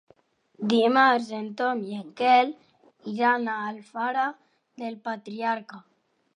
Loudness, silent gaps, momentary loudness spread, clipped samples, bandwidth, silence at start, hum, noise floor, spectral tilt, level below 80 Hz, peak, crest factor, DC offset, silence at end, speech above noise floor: -25 LUFS; none; 16 LU; under 0.1%; 10.5 kHz; 0.6 s; none; -62 dBFS; -5 dB/octave; -82 dBFS; -6 dBFS; 20 dB; under 0.1%; 0.55 s; 37 dB